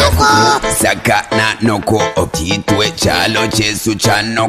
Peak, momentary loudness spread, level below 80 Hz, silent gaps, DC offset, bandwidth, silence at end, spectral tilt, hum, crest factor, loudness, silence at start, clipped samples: 0 dBFS; 6 LU; -30 dBFS; none; 0.1%; 15.5 kHz; 0 s; -3.5 dB/octave; none; 12 dB; -12 LUFS; 0 s; under 0.1%